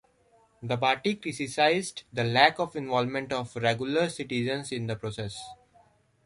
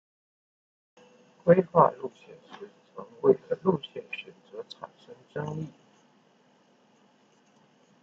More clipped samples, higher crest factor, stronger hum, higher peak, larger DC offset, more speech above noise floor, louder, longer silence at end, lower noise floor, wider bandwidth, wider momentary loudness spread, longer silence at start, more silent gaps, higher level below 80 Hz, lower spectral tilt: neither; about the same, 24 dB vs 26 dB; neither; about the same, -4 dBFS vs -6 dBFS; neither; about the same, 36 dB vs 36 dB; about the same, -28 LUFS vs -26 LUFS; second, 0.7 s vs 2.35 s; about the same, -64 dBFS vs -63 dBFS; first, 11.5 kHz vs 7.2 kHz; second, 13 LU vs 24 LU; second, 0.6 s vs 1.45 s; neither; first, -64 dBFS vs -72 dBFS; second, -4.5 dB/octave vs -8.5 dB/octave